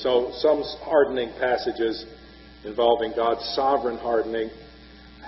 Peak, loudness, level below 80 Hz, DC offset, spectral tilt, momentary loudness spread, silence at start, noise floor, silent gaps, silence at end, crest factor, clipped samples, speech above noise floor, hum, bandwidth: -6 dBFS; -24 LUFS; -52 dBFS; under 0.1%; -2 dB/octave; 12 LU; 0 s; -47 dBFS; none; 0 s; 18 dB; under 0.1%; 23 dB; none; 6 kHz